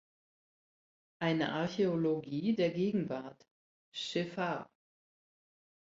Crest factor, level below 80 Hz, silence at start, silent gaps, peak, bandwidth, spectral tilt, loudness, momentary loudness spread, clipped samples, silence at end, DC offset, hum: 18 dB; -74 dBFS; 1.2 s; 3.51-3.92 s; -20 dBFS; 7.8 kHz; -6.5 dB/octave; -34 LUFS; 11 LU; under 0.1%; 1.2 s; under 0.1%; none